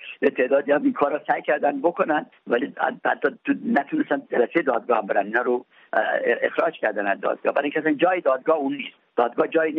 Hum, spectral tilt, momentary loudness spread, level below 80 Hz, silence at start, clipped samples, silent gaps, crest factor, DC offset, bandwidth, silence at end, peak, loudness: none; -3 dB/octave; 5 LU; -74 dBFS; 0 s; under 0.1%; none; 16 dB; under 0.1%; 4.9 kHz; 0 s; -6 dBFS; -23 LUFS